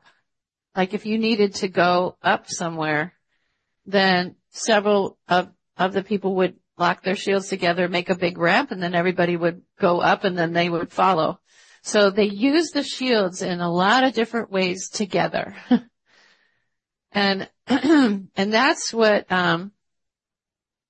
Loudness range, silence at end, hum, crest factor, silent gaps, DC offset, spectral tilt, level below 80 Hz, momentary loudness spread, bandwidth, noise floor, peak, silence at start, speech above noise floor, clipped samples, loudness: 2 LU; 1.2 s; none; 18 dB; none; under 0.1%; -4.5 dB/octave; -66 dBFS; 7 LU; 8.8 kHz; -89 dBFS; -4 dBFS; 0.75 s; 68 dB; under 0.1%; -21 LUFS